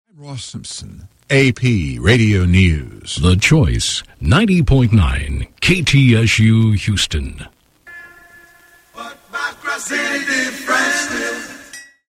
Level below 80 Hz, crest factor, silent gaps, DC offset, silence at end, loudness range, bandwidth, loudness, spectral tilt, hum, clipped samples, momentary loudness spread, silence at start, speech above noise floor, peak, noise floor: -28 dBFS; 16 dB; none; under 0.1%; 0.3 s; 9 LU; 15.5 kHz; -15 LUFS; -5 dB/octave; none; under 0.1%; 18 LU; 0.2 s; 33 dB; 0 dBFS; -48 dBFS